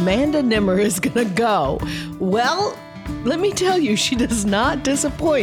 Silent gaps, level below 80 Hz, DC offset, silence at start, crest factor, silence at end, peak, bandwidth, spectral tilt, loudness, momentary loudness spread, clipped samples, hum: none; -38 dBFS; under 0.1%; 0 s; 14 dB; 0 s; -6 dBFS; 18 kHz; -4.5 dB/octave; -19 LUFS; 8 LU; under 0.1%; none